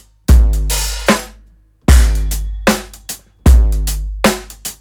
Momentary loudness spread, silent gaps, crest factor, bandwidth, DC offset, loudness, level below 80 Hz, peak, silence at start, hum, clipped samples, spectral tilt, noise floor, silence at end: 15 LU; none; 12 dB; 20 kHz; under 0.1%; -15 LUFS; -14 dBFS; 0 dBFS; 0.3 s; none; under 0.1%; -5 dB/octave; -46 dBFS; 0.05 s